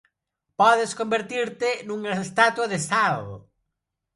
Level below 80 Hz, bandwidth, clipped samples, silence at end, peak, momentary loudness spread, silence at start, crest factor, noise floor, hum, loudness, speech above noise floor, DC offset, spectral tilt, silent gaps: -64 dBFS; 11.5 kHz; under 0.1%; 0.75 s; -4 dBFS; 10 LU; 0.6 s; 20 dB; -82 dBFS; none; -23 LUFS; 59 dB; under 0.1%; -3.5 dB/octave; none